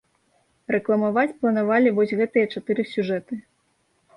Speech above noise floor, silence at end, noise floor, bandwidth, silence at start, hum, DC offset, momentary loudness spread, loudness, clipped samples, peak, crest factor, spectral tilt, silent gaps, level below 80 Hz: 46 dB; 0.75 s; -67 dBFS; 10.5 kHz; 0.7 s; none; under 0.1%; 10 LU; -22 LUFS; under 0.1%; -8 dBFS; 16 dB; -8 dB/octave; none; -68 dBFS